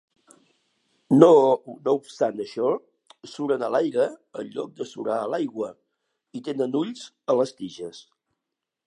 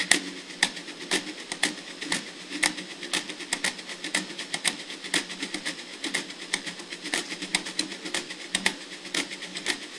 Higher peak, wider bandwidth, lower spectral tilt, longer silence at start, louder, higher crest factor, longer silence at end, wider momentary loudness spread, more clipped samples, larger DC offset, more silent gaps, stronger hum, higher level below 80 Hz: about the same, 0 dBFS vs 0 dBFS; about the same, 11 kHz vs 12 kHz; first, -6.5 dB/octave vs -0.5 dB/octave; first, 1.1 s vs 0 s; first, -23 LUFS vs -29 LUFS; second, 24 dB vs 32 dB; first, 0.9 s vs 0 s; first, 19 LU vs 8 LU; neither; neither; neither; neither; second, -78 dBFS vs -70 dBFS